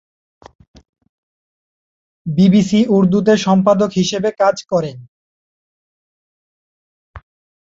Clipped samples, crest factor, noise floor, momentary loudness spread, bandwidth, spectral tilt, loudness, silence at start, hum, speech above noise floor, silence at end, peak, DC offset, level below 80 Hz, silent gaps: under 0.1%; 16 dB; under -90 dBFS; 8 LU; 7.8 kHz; -6.5 dB/octave; -14 LUFS; 2.25 s; none; over 77 dB; 0.55 s; -2 dBFS; under 0.1%; -52 dBFS; 5.08-7.14 s